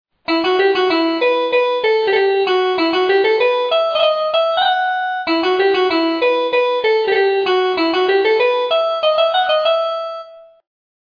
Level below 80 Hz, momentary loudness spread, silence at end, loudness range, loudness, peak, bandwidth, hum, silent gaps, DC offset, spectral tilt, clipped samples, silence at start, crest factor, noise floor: -62 dBFS; 3 LU; 0.65 s; 1 LU; -15 LUFS; -4 dBFS; 5.4 kHz; none; none; under 0.1%; -4 dB/octave; under 0.1%; 0.3 s; 12 dB; -36 dBFS